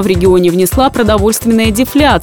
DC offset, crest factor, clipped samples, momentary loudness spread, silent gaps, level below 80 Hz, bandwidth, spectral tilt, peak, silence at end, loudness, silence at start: under 0.1%; 10 dB; under 0.1%; 2 LU; none; -24 dBFS; over 20 kHz; -5 dB/octave; 0 dBFS; 0 s; -10 LUFS; 0 s